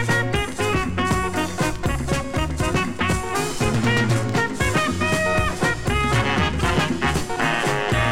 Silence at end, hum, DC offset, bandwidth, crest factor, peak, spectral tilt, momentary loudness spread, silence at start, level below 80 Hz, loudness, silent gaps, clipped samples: 0 s; none; 2%; 16.5 kHz; 16 dB; -6 dBFS; -5 dB/octave; 4 LU; 0 s; -32 dBFS; -21 LUFS; none; under 0.1%